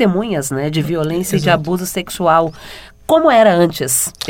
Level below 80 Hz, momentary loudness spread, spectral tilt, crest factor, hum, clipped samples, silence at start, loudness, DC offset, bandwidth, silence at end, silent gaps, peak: -44 dBFS; 12 LU; -4.5 dB/octave; 14 dB; none; under 0.1%; 0 s; -15 LUFS; under 0.1%; 19 kHz; 0 s; none; 0 dBFS